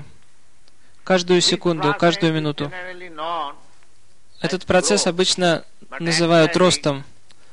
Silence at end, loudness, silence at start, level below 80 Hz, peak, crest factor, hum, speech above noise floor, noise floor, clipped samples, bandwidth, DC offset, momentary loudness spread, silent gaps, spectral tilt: 0.5 s; -19 LUFS; 0 s; -54 dBFS; -4 dBFS; 18 dB; none; 39 dB; -58 dBFS; under 0.1%; 11 kHz; 1%; 14 LU; none; -4 dB/octave